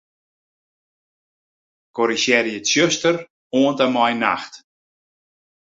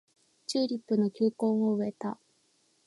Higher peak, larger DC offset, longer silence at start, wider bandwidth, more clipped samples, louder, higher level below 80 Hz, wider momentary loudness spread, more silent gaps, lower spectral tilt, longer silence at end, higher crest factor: first, -2 dBFS vs -16 dBFS; neither; first, 1.95 s vs 0.5 s; second, 8 kHz vs 11.5 kHz; neither; first, -19 LUFS vs -30 LUFS; first, -66 dBFS vs -82 dBFS; about the same, 10 LU vs 11 LU; first, 3.30-3.50 s vs none; second, -3 dB/octave vs -6.5 dB/octave; first, 1.2 s vs 0.7 s; about the same, 20 dB vs 16 dB